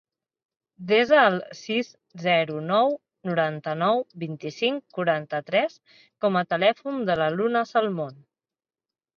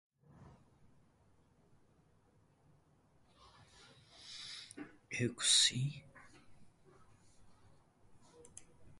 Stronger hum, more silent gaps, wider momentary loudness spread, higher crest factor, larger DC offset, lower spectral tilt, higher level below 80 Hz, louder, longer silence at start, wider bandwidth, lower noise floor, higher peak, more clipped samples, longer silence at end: neither; neither; second, 12 LU vs 29 LU; second, 20 dB vs 26 dB; neither; first, -6 dB/octave vs -2 dB/octave; about the same, -70 dBFS vs -74 dBFS; first, -24 LUFS vs -33 LUFS; first, 0.8 s vs 0.4 s; second, 7 kHz vs 11.5 kHz; first, under -90 dBFS vs -71 dBFS; first, -6 dBFS vs -18 dBFS; neither; first, 1 s vs 0 s